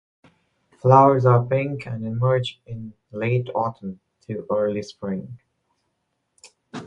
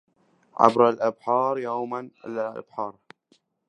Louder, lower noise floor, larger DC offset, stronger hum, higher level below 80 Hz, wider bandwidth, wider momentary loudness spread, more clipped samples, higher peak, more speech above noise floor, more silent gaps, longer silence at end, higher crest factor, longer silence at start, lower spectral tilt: first, -21 LUFS vs -24 LUFS; first, -75 dBFS vs -66 dBFS; neither; neither; first, -58 dBFS vs -72 dBFS; second, 8.4 kHz vs 9.8 kHz; first, 22 LU vs 16 LU; neither; about the same, -2 dBFS vs 0 dBFS; first, 54 dB vs 42 dB; neither; second, 0 s vs 0.8 s; about the same, 22 dB vs 24 dB; first, 0.85 s vs 0.6 s; first, -8 dB/octave vs -6.5 dB/octave